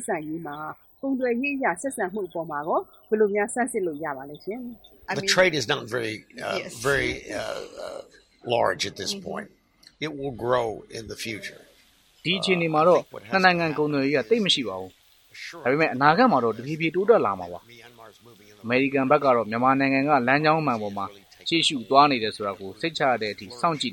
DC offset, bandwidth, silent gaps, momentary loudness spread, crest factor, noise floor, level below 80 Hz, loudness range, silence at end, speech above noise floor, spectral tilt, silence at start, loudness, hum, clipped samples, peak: under 0.1%; 17.5 kHz; none; 16 LU; 24 dB; -59 dBFS; -58 dBFS; 7 LU; 0 s; 35 dB; -4.5 dB/octave; 0 s; -24 LUFS; none; under 0.1%; -2 dBFS